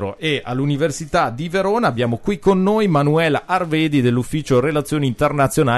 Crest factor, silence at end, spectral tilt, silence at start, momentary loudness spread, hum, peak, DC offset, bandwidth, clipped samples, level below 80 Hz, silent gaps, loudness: 14 dB; 0 s; -6 dB/octave; 0 s; 5 LU; none; -4 dBFS; under 0.1%; 12.5 kHz; under 0.1%; -42 dBFS; none; -18 LUFS